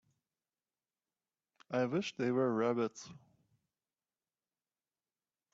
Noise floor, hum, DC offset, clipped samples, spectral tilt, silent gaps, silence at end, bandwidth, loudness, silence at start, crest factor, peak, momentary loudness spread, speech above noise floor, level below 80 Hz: under -90 dBFS; none; under 0.1%; under 0.1%; -6 dB/octave; none; 2.4 s; 7.8 kHz; -35 LUFS; 1.7 s; 20 dB; -20 dBFS; 12 LU; over 55 dB; -82 dBFS